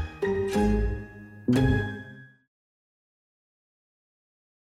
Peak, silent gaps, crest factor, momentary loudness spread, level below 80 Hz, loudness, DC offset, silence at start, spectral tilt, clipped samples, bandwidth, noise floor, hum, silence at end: -12 dBFS; none; 18 dB; 17 LU; -38 dBFS; -27 LUFS; under 0.1%; 0 s; -7.5 dB/octave; under 0.1%; 14.5 kHz; -46 dBFS; none; 2.4 s